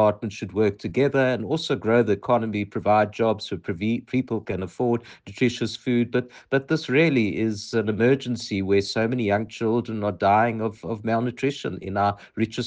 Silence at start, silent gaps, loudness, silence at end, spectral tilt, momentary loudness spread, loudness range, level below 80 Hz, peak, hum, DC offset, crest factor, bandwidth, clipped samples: 0 s; none; -24 LUFS; 0 s; -6.5 dB/octave; 8 LU; 3 LU; -60 dBFS; -6 dBFS; none; under 0.1%; 16 dB; 9.4 kHz; under 0.1%